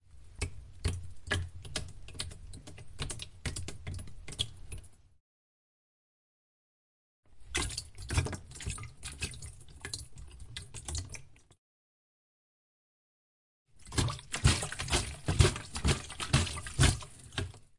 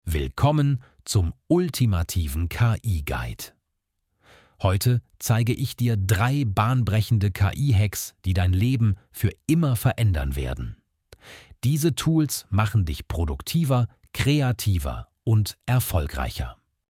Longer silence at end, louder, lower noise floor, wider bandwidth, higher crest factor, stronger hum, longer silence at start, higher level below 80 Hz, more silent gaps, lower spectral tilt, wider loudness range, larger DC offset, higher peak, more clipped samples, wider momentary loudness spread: second, 0.1 s vs 0.35 s; second, -35 LUFS vs -24 LUFS; first, under -90 dBFS vs -78 dBFS; second, 11.5 kHz vs 16.5 kHz; first, 28 dB vs 16 dB; neither; about the same, 0.05 s vs 0.05 s; second, -44 dBFS vs -36 dBFS; first, 5.20-7.23 s, 11.58-13.66 s vs none; second, -3.5 dB/octave vs -6 dB/octave; first, 14 LU vs 3 LU; neither; second, -10 dBFS vs -6 dBFS; neither; first, 19 LU vs 8 LU